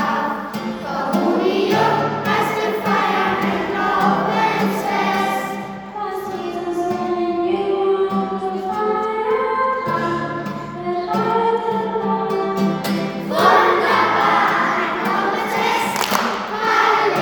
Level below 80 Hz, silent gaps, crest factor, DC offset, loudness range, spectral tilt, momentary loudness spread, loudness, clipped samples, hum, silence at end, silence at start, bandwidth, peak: -54 dBFS; none; 18 dB; under 0.1%; 5 LU; -5 dB/octave; 10 LU; -19 LUFS; under 0.1%; none; 0 s; 0 s; over 20 kHz; 0 dBFS